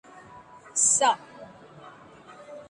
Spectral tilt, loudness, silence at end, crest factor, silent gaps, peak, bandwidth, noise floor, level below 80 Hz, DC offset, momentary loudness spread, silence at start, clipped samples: 0 dB/octave; -22 LUFS; 0.05 s; 20 dB; none; -10 dBFS; 11.5 kHz; -49 dBFS; -70 dBFS; under 0.1%; 27 LU; 0.35 s; under 0.1%